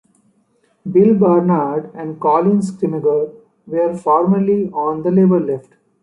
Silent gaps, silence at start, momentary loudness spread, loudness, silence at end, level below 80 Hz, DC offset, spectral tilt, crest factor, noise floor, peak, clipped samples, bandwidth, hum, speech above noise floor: none; 0.85 s; 11 LU; -16 LUFS; 0.4 s; -60 dBFS; under 0.1%; -10 dB/octave; 14 dB; -60 dBFS; -2 dBFS; under 0.1%; 10.5 kHz; none; 45 dB